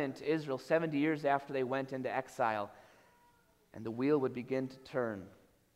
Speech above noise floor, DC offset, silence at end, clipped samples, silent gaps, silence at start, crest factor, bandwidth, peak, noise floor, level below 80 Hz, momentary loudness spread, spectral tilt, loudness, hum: 34 dB; under 0.1%; 0.45 s; under 0.1%; none; 0 s; 20 dB; 15.5 kHz; -16 dBFS; -69 dBFS; -76 dBFS; 13 LU; -7 dB/octave; -35 LUFS; none